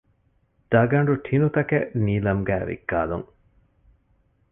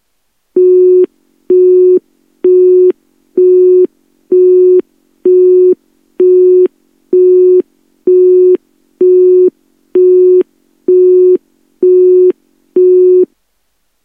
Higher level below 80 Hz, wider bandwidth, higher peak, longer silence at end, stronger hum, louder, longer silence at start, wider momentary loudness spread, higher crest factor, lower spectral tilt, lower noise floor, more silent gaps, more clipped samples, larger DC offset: first, -46 dBFS vs -70 dBFS; first, 3.7 kHz vs 1.2 kHz; second, -6 dBFS vs 0 dBFS; first, 1.25 s vs 0.8 s; neither; second, -23 LUFS vs -8 LUFS; first, 0.7 s vs 0.55 s; about the same, 7 LU vs 9 LU; first, 18 dB vs 8 dB; first, -11.5 dB/octave vs -10 dB/octave; about the same, -65 dBFS vs -64 dBFS; neither; neither; neither